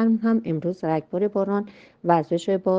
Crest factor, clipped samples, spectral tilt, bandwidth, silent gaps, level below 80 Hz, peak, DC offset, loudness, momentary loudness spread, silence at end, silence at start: 18 dB; under 0.1%; -8 dB/octave; 7.6 kHz; none; -66 dBFS; -4 dBFS; under 0.1%; -24 LUFS; 6 LU; 0 s; 0 s